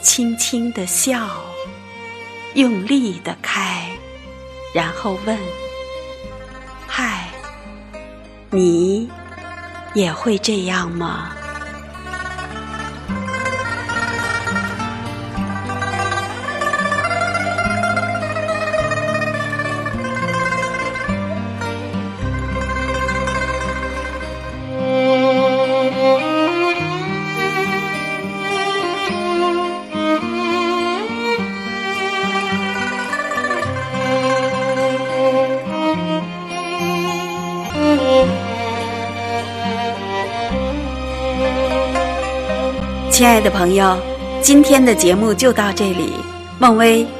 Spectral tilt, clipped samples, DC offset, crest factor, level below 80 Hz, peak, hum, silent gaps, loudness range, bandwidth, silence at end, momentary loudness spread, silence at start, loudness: -4 dB/octave; under 0.1%; under 0.1%; 18 dB; -36 dBFS; 0 dBFS; none; none; 9 LU; 14.5 kHz; 0 s; 15 LU; 0 s; -18 LUFS